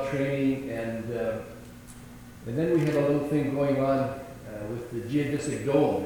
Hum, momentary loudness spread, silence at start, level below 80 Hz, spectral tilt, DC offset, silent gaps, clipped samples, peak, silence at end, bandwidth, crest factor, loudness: none; 20 LU; 0 s; -54 dBFS; -7 dB/octave; under 0.1%; none; under 0.1%; -10 dBFS; 0 s; 19.5 kHz; 18 dB; -28 LUFS